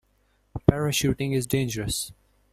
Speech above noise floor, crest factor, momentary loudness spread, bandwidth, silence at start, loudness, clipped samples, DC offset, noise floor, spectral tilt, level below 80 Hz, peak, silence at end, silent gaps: 40 dB; 26 dB; 8 LU; 16 kHz; 0.55 s; -25 LUFS; under 0.1%; under 0.1%; -66 dBFS; -5 dB/octave; -44 dBFS; -2 dBFS; 0.4 s; none